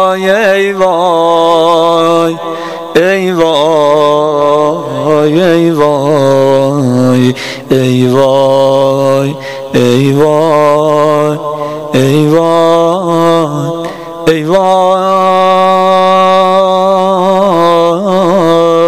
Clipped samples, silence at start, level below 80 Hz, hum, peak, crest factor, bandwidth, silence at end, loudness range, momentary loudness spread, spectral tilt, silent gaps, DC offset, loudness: 0.6%; 0 s; -48 dBFS; none; 0 dBFS; 8 dB; 15.5 kHz; 0 s; 2 LU; 6 LU; -6 dB/octave; none; 1%; -8 LUFS